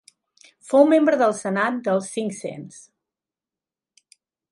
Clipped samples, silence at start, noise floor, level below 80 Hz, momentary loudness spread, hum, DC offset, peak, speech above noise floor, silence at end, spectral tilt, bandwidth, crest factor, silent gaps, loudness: under 0.1%; 0.7 s; under -90 dBFS; -76 dBFS; 18 LU; none; under 0.1%; -2 dBFS; over 70 dB; 1.7 s; -5.5 dB/octave; 11.5 kHz; 22 dB; none; -20 LUFS